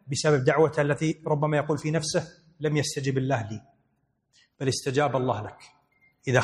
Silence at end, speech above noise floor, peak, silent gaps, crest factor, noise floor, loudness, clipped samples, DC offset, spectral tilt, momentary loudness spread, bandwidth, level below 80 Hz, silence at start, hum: 0 s; 47 dB; -4 dBFS; none; 22 dB; -73 dBFS; -26 LUFS; under 0.1%; under 0.1%; -5.5 dB/octave; 11 LU; 12.5 kHz; -62 dBFS; 0.05 s; none